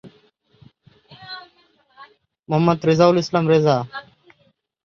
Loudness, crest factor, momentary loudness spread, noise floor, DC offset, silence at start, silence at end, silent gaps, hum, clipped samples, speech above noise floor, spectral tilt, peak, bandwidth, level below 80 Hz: -17 LUFS; 20 dB; 21 LU; -63 dBFS; under 0.1%; 0.05 s; 0.85 s; none; none; under 0.1%; 46 dB; -7 dB/octave; -2 dBFS; 7.2 kHz; -60 dBFS